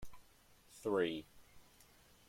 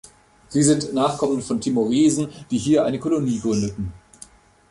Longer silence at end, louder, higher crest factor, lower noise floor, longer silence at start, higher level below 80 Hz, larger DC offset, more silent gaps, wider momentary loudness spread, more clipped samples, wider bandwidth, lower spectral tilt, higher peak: second, 0.45 s vs 0.75 s; second, -39 LUFS vs -21 LUFS; first, 22 dB vs 16 dB; first, -66 dBFS vs -48 dBFS; second, 0 s vs 0.5 s; second, -66 dBFS vs -50 dBFS; neither; neither; first, 25 LU vs 8 LU; neither; first, 16.5 kHz vs 11.5 kHz; about the same, -5 dB/octave vs -5.5 dB/octave; second, -22 dBFS vs -6 dBFS